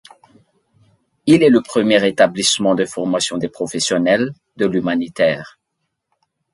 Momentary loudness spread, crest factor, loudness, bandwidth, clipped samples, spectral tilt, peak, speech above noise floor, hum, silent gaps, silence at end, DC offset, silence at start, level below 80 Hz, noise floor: 10 LU; 18 dB; -16 LUFS; 11.5 kHz; under 0.1%; -4 dB/octave; 0 dBFS; 59 dB; none; none; 1.05 s; under 0.1%; 1.25 s; -58 dBFS; -74 dBFS